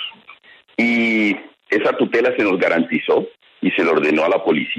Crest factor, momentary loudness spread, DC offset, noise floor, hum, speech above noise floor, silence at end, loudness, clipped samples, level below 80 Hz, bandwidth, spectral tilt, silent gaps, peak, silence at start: 14 dB; 8 LU; under 0.1%; -46 dBFS; none; 29 dB; 0 s; -17 LUFS; under 0.1%; -66 dBFS; 9 kHz; -6 dB/octave; none; -4 dBFS; 0 s